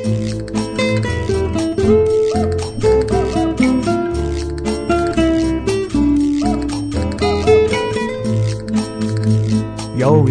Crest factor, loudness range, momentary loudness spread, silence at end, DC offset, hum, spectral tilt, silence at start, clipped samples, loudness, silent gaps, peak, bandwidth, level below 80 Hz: 14 dB; 1 LU; 7 LU; 0 s; under 0.1%; none; -6.5 dB/octave; 0 s; under 0.1%; -17 LUFS; none; -2 dBFS; 10.5 kHz; -30 dBFS